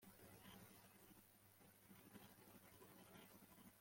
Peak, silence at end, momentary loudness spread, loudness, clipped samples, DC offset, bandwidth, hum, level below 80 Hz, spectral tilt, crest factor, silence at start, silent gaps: -48 dBFS; 0 s; 5 LU; -66 LUFS; under 0.1%; under 0.1%; 16.5 kHz; none; -86 dBFS; -4 dB/octave; 18 dB; 0 s; none